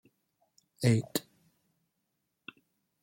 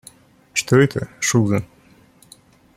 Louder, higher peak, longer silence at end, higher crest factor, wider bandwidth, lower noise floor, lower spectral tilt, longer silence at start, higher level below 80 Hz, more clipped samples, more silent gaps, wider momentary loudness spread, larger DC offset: second, -31 LUFS vs -19 LUFS; second, -12 dBFS vs -2 dBFS; first, 1.8 s vs 1.15 s; about the same, 24 dB vs 20 dB; about the same, 16.5 kHz vs 15.5 kHz; first, -82 dBFS vs -51 dBFS; about the same, -6 dB/octave vs -5 dB/octave; first, 0.8 s vs 0.55 s; second, -68 dBFS vs -54 dBFS; neither; neither; first, 23 LU vs 9 LU; neither